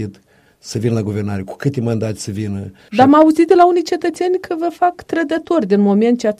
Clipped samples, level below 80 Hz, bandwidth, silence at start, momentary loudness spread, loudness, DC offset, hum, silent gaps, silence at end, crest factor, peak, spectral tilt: under 0.1%; -54 dBFS; 13.5 kHz; 0 s; 13 LU; -15 LUFS; under 0.1%; none; none; 0.05 s; 16 dB; 0 dBFS; -7 dB/octave